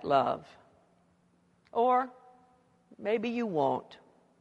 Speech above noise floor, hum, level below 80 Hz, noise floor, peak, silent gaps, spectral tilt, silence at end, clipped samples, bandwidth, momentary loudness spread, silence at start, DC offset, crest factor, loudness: 38 dB; none; -76 dBFS; -68 dBFS; -14 dBFS; none; -7 dB/octave; 0.45 s; under 0.1%; 8.2 kHz; 12 LU; 0 s; under 0.1%; 20 dB; -31 LUFS